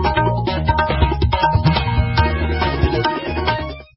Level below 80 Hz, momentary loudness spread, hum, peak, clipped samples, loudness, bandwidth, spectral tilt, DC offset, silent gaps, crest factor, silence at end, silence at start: -22 dBFS; 4 LU; none; -4 dBFS; under 0.1%; -18 LUFS; 5.8 kHz; -10.5 dB/octave; under 0.1%; none; 14 dB; 0.15 s; 0 s